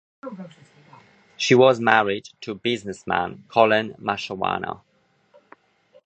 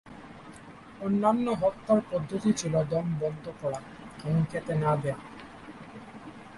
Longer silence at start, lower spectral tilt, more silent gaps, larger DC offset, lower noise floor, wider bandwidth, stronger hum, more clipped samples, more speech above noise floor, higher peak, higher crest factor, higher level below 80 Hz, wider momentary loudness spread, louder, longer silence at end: first, 0.25 s vs 0.05 s; second, -4.5 dB/octave vs -7 dB/octave; neither; neither; first, -59 dBFS vs -48 dBFS; second, 8.6 kHz vs 11.5 kHz; neither; neither; first, 38 dB vs 20 dB; first, 0 dBFS vs -12 dBFS; first, 24 dB vs 18 dB; about the same, -62 dBFS vs -58 dBFS; about the same, 22 LU vs 21 LU; first, -21 LUFS vs -29 LUFS; first, 1.3 s vs 0 s